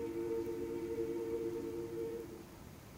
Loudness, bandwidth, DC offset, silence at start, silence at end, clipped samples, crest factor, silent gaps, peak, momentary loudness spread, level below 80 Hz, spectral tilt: -41 LUFS; 16 kHz; under 0.1%; 0 s; 0 s; under 0.1%; 12 dB; none; -28 dBFS; 12 LU; -62 dBFS; -6.5 dB/octave